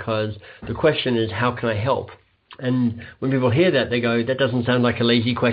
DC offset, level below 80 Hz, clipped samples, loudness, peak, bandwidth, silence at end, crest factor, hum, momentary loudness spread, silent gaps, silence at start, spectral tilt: under 0.1%; -54 dBFS; under 0.1%; -21 LUFS; -4 dBFS; 5 kHz; 0 s; 16 dB; none; 10 LU; none; 0 s; -4.5 dB/octave